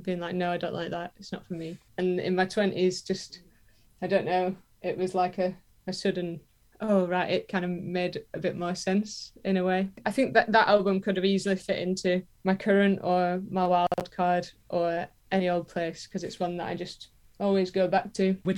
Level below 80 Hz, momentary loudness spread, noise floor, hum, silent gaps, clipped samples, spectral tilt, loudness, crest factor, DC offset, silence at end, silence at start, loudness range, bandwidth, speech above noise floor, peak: -62 dBFS; 13 LU; -60 dBFS; none; none; under 0.1%; -6 dB/octave; -28 LUFS; 20 dB; under 0.1%; 0 s; 0 s; 5 LU; 12 kHz; 32 dB; -8 dBFS